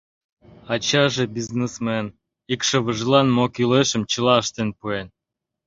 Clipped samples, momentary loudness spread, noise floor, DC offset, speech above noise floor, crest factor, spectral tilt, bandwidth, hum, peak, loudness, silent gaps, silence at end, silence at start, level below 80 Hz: under 0.1%; 11 LU; -84 dBFS; under 0.1%; 63 dB; 18 dB; -4.5 dB/octave; 7.8 kHz; none; -2 dBFS; -21 LUFS; none; 0.6 s; 0.65 s; -56 dBFS